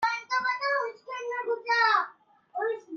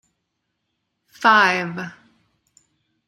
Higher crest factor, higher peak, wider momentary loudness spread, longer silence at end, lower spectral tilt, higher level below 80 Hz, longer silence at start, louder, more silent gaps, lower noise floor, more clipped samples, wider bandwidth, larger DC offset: about the same, 18 dB vs 22 dB; second, -12 dBFS vs -2 dBFS; second, 13 LU vs 19 LU; second, 0 s vs 1.15 s; second, -1 dB/octave vs -4 dB/octave; second, -80 dBFS vs -72 dBFS; second, 0 s vs 1.2 s; second, -28 LUFS vs -17 LUFS; neither; second, -52 dBFS vs -76 dBFS; neither; second, 7.2 kHz vs 14 kHz; neither